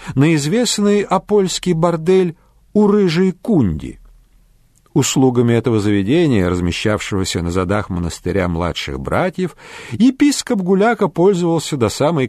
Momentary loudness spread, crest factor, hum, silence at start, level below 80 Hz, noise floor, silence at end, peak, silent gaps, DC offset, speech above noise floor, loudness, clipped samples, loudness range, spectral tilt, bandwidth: 7 LU; 14 dB; none; 0 s; -40 dBFS; -53 dBFS; 0 s; -2 dBFS; none; under 0.1%; 37 dB; -16 LUFS; under 0.1%; 3 LU; -5.5 dB/octave; 14 kHz